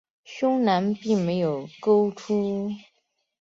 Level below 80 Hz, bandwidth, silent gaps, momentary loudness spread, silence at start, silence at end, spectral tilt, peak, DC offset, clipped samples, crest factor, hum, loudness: -68 dBFS; 7.6 kHz; none; 10 LU; 0.3 s; 0.6 s; -7 dB/octave; -8 dBFS; under 0.1%; under 0.1%; 16 dB; none; -24 LUFS